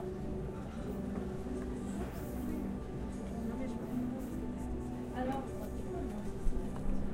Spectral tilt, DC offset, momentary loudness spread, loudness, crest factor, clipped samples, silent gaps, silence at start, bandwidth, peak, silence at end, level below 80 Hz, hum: -7.5 dB/octave; under 0.1%; 3 LU; -40 LUFS; 18 dB; under 0.1%; none; 0 s; 16 kHz; -20 dBFS; 0 s; -44 dBFS; none